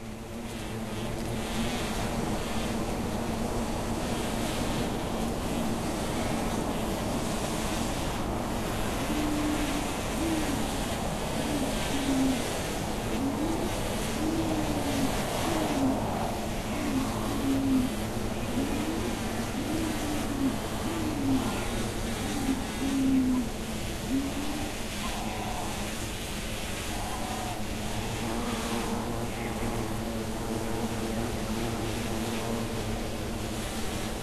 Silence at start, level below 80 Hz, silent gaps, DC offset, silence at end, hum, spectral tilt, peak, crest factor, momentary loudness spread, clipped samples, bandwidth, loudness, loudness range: 0 s; -40 dBFS; none; 0.1%; 0 s; none; -4.5 dB/octave; -16 dBFS; 14 dB; 5 LU; under 0.1%; 14 kHz; -31 LUFS; 3 LU